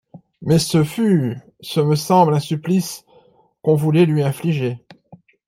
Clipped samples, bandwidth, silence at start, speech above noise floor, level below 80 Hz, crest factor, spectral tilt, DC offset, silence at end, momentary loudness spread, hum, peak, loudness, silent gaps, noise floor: under 0.1%; 16 kHz; 0.15 s; 37 dB; -56 dBFS; 16 dB; -6.5 dB/octave; under 0.1%; 0.3 s; 14 LU; none; -2 dBFS; -18 LUFS; none; -54 dBFS